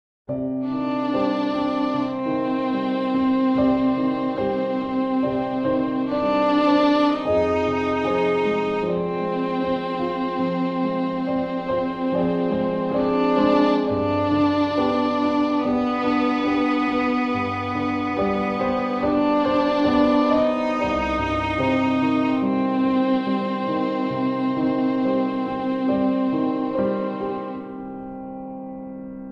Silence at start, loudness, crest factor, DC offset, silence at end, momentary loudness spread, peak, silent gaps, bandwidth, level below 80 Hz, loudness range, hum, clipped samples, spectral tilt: 0.3 s; -22 LUFS; 14 dB; under 0.1%; 0 s; 6 LU; -8 dBFS; none; 7 kHz; -48 dBFS; 3 LU; none; under 0.1%; -7.5 dB/octave